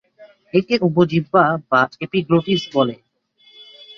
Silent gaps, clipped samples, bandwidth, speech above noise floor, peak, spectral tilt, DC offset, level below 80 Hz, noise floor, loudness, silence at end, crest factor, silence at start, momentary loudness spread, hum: none; under 0.1%; 7 kHz; 38 dB; -2 dBFS; -7 dB/octave; under 0.1%; -58 dBFS; -55 dBFS; -18 LUFS; 1.05 s; 18 dB; 0.2 s; 5 LU; none